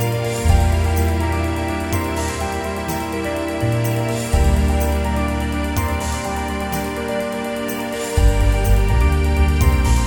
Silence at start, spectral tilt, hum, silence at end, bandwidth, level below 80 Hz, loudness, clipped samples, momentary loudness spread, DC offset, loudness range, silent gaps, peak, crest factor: 0 s; -5.5 dB/octave; none; 0 s; 18 kHz; -20 dBFS; -20 LUFS; under 0.1%; 7 LU; under 0.1%; 3 LU; none; -2 dBFS; 16 dB